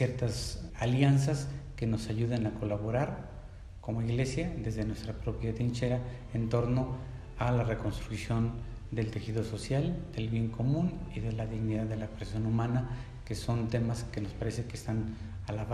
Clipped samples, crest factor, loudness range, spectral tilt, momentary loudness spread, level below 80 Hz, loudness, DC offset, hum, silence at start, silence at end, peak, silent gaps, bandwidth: under 0.1%; 20 dB; 3 LU; -7 dB/octave; 9 LU; -46 dBFS; -33 LUFS; under 0.1%; none; 0 s; 0 s; -14 dBFS; none; 12.5 kHz